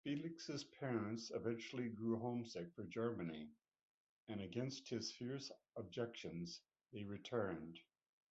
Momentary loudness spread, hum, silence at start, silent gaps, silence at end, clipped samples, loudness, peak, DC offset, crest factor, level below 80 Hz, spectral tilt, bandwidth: 11 LU; none; 0.05 s; 3.81-4.27 s; 0.5 s; under 0.1%; -47 LUFS; -28 dBFS; under 0.1%; 18 dB; -76 dBFS; -5.5 dB/octave; 8 kHz